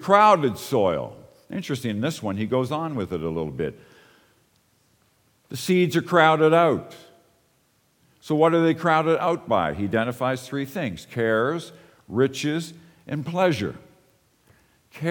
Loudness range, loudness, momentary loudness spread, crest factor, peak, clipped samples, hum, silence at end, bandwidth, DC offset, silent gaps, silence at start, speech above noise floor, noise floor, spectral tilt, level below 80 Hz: 7 LU; -23 LUFS; 14 LU; 22 dB; -2 dBFS; under 0.1%; none; 0 s; 19 kHz; under 0.1%; none; 0 s; 43 dB; -65 dBFS; -6 dB/octave; -58 dBFS